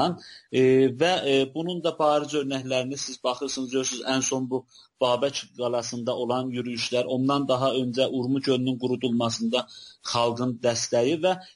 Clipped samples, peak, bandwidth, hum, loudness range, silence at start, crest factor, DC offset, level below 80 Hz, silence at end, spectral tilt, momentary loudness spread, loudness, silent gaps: under 0.1%; -10 dBFS; 11.5 kHz; none; 3 LU; 0 s; 16 dB; under 0.1%; -68 dBFS; 0.05 s; -4.5 dB/octave; 7 LU; -25 LUFS; none